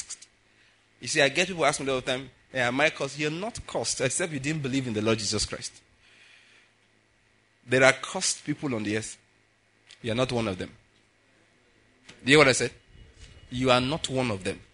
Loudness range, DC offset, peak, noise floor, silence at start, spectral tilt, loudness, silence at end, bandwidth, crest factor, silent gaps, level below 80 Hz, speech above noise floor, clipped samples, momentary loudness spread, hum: 7 LU; under 0.1%; -2 dBFS; -65 dBFS; 0 s; -3.5 dB/octave; -26 LUFS; 0.15 s; 11 kHz; 28 dB; none; -56 dBFS; 39 dB; under 0.1%; 16 LU; none